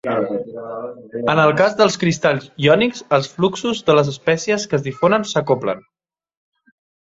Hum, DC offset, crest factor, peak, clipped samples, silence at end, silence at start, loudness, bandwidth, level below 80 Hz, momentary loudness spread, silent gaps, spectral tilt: none; under 0.1%; 18 dB; -2 dBFS; under 0.1%; 1.25 s; 0.05 s; -17 LUFS; 8 kHz; -56 dBFS; 12 LU; none; -5 dB/octave